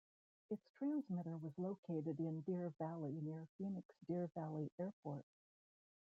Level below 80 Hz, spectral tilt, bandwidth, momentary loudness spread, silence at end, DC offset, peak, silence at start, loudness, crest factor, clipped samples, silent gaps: -88 dBFS; -11 dB/octave; 6.8 kHz; 8 LU; 0.95 s; under 0.1%; -34 dBFS; 0.5 s; -47 LUFS; 14 dB; under 0.1%; 0.69-0.74 s, 1.78-1.83 s, 3.49-3.59 s, 3.85-3.89 s, 4.72-4.78 s, 4.93-5.03 s